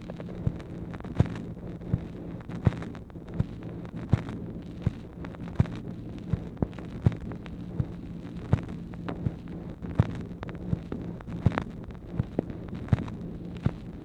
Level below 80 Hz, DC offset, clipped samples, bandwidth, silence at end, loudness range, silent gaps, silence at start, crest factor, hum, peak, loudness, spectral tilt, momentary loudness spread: -44 dBFS; under 0.1%; under 0.1%; 8.6 kHz; 0 s; 1 LU; none; 0 s; 26 dB; none; -6 dBFS; -33 LUFS; -9 dB/octave; 10 LU